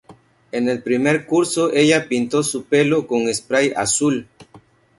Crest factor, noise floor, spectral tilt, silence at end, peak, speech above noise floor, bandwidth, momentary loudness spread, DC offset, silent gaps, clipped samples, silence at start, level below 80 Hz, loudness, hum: 18 dB; -49 dBFS; -4 dB/octave; 0.4 s; -2 dBFS; 31 dB; 11.5 kHz; 6 LU; under 0.1%; none; under 0.1%; 0.1 s; -58 dBFS; -18 LUFS; none